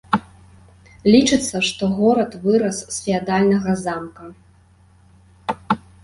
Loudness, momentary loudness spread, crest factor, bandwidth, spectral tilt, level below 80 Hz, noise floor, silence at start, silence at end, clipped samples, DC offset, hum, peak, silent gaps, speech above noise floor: -19 LUFS; 14 LU; 18 dB; 11.5 kHz; -5 dB/octave; -50 dBFS; -52 dBFS; 0.1 s; 0.25 s; under 0.1%; under 0.1%; none; -2 dBFS; none; 34 dB